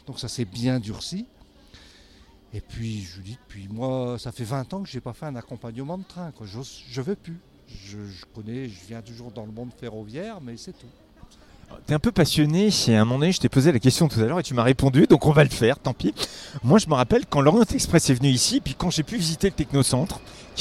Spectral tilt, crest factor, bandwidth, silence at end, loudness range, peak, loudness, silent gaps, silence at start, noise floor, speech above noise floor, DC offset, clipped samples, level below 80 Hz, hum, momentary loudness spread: -5.5 dB/octave; 20 dB; 15 kHz; 0 s; 18 LU; -4 dBFS; -22 LUFS; none; 0.1 s; -52 dBFS; 29 dB; under 0.1%; under 0.1%; -44 dBFS; none; 21 LU